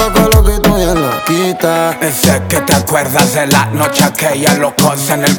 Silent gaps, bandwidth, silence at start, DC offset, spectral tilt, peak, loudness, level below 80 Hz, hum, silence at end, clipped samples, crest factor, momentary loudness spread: none; over 20 kHz; 0 s; under 0.1%; -4 dB/octave; 0 dBFS; -11 LUFS; -20 dBFS; none; 0 s; 0.2%; 10 dB; 4 LU